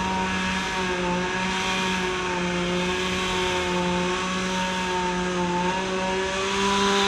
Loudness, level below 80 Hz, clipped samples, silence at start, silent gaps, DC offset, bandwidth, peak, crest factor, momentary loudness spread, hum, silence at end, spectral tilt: -24 LUFS; -44 dBFS; under 0.1%; 0 s; none; under 0.1%; 14.5 kHz; -10 dBFS; 16 dB; 2 LU; none; 0 s; -4 dB/octave